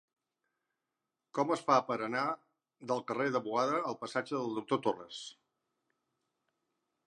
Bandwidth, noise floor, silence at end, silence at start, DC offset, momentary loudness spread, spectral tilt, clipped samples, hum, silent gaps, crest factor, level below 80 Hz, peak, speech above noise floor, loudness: 11 kHz; -89 dBFS; 1.75 s; 1.35 s; under 0.1%; 14 LU; -5 dB/octave; under 0.1%; none; none; 24 dB; -88 dBFS; -12 dBFS; 55 dB; -34 LUFS